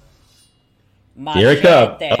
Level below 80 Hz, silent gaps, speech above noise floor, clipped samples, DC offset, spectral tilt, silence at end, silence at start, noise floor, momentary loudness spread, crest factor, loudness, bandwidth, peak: -50 dBFS; none; 45 dB; under 0.1%; under 0.1%; -6 dB/octave; 0 s; 1.2 s; -57 dBFS; 12 LU; 14 dB; -12 LUFS; 14.5 kHz; -2 dBFS